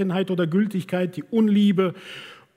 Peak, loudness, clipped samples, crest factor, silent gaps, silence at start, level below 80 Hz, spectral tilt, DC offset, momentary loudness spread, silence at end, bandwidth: -8 dBFS; -22 LUFS; under 0.1%; 16 dB; none; 0 s; -72 dBFS; -8 dB/octave; under 0.1%; 18 LU; 0.25 s; 12 kHz